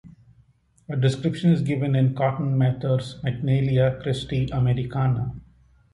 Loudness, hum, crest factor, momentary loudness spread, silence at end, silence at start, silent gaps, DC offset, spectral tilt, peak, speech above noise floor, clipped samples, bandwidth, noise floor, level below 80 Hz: -23 LUFS; none; 16 dB; 7 LU; 0.5 s; 0.05 s; none; under 0.1%; -8 dB/octave; -8 dBFS; 37 dB; under 0.1%; 11 kHz; -59 dBFS; -48 dBFS